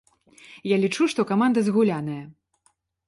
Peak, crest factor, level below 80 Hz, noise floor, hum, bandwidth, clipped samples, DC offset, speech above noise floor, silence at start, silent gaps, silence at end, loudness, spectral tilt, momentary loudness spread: -8 dBFS; 16 dB; -68 dBFS; -67 dBFS; none; 11.5 kHz; under 0.1%; under 0.1%; 45 dB; 0.5 s; none; 0.75 s; -23 LUFS; -6 dB/octave; 13 LU